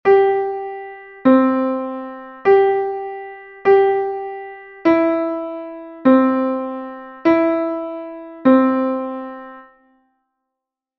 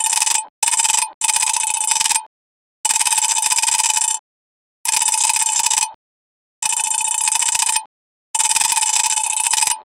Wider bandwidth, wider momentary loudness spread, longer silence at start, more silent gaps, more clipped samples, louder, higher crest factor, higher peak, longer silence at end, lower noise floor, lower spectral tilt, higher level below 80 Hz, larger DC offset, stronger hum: second, 5.8 kHz vs over 20 kHz; first, 19 LU vs 6 LU; about the same, 0.05 s vs 0 s; second, none vs 0.50-0.62 s, 1.14-1.21 s, 2.26-2.84 s, 4.19-4.85 s, 5.95-6.62 s, 7.86-8.34 s; neither; about the same, -17 LUFS vs -16 LUFS; about the same, 16 dB vs 20 dB; about the same, -2 dBFS vs 0 dBFS; first, 1.35 s vs 0.15 s; second, -83 dBFS vs under -90 dBFS; first, -8 dB/octave vs 4.5 dB/octave; first, -60 dBFS vs -66 dBFS; neither; neither